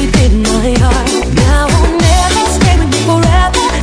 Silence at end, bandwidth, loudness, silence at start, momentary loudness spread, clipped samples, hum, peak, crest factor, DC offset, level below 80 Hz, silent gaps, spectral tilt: 0 s; 11 kHz; -10 LUFS; 0 s; 2 LU; 0.4%; none; 0 dBFS; 8 dB; under 0.1%; -14 dBFS; none; -5 dB/octave